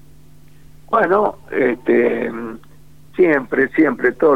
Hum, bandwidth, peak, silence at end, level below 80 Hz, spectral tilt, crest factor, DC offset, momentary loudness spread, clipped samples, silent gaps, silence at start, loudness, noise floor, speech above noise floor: none; 5.2 kHz; -2 dBFS; 0 s; -52 dBFS; -8 dB/octave; 16 dB; 0.8%; 10 LU; under 0.1%; none; 0.9 s; -17 LUFS; -47 dBFS; 31 dB